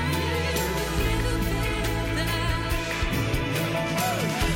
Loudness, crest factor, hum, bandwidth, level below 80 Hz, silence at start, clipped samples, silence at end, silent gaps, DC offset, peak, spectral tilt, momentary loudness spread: -26 LUFS; 12 dB; none; 17 kHz; -32 dBFS; 0 s; under 0.1%; 0 s; none; under 0.1%; -14 dBFS; -4.5 dB/octave; 1 LU